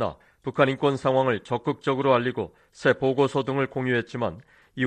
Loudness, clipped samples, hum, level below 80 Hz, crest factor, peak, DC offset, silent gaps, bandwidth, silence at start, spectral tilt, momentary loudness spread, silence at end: -25 LUFS; under 0.1%; none; -60 dBFS; 18 dB; -6 dBFS; under 0.1%; none; 9.4 kHz; 0 s; -7 dB/octave; 10 LU; 0 s